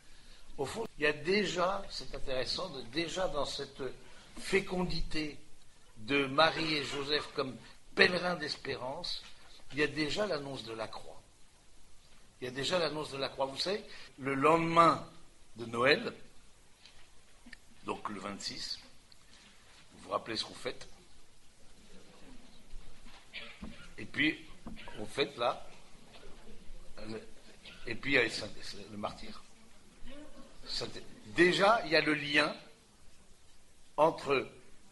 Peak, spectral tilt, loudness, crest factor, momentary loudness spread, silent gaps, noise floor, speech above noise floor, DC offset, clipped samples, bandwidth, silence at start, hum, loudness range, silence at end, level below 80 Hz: -8 dBFS; -4 dB/octave; -33 LUFS; 28 dB; 23 LU; none; -57 dBFS; 24 dB; under 0.1%; under 0.1%; 11.5 kHz; 0.05 s; none; 12 LU; 0 s; -52 dBFS